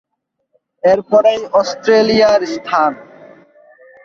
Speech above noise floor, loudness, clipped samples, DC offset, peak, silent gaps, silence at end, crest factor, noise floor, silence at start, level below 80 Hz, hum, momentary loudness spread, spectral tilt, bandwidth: 56 dB; -13 LUFS; under 0.1%; under 0.1%; 0 dBFS; none; 1 s; 14 dB; -68 dBFS; 0.85 s; -54 dBFS; none; 7 LU; -4.5 dB/octave; 7.4 kHz